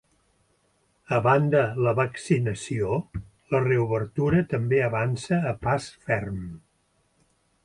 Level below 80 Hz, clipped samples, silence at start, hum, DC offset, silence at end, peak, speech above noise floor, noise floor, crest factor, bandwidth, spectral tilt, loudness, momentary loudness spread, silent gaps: -52 dBFS; under 0.1%; 1.1 s; none; under 0.1%; 1.1 s; -8 dBFS; 44 dB; -68 dBFS; 18 dB; 11.5 kHz; -7 dB/octave; -25 LUFS; 8 LU; none